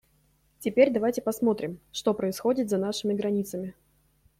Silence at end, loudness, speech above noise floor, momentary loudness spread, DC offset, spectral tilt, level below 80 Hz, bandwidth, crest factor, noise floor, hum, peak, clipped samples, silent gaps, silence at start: 0.65 s; -27 LUFS; 40 dB; 12 LU; under 0.1%; -5.5 dB/octave; -64 dBFS; 16.5 kHz; 20 dB; -66 dBFS; none; -8 dBFS; under 0.1%; none; 0.6 s